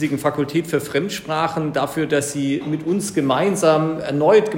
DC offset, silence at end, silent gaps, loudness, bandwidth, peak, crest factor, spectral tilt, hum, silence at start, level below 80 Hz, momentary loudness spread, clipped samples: under 0.1%; 0 s; none; -20 LUFS; 16.5 kHz; -2 dBFS; 16 dB; -5.5 dB/octave; none; 0 s; -56 dBFS; 6 LU; under 0.1%